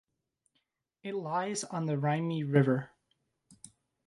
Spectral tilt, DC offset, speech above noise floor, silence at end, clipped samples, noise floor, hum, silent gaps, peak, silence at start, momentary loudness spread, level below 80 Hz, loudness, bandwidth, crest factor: -6.5 dB/octave; under 0.1%; 50 dB; 1.2 s; under 0.1%; -80 dBFS; none; none; -12 dBFS; 1.05 s; 12 LU; -76 dBFS; -31 LUFS; 11.5 kHz; 22 dB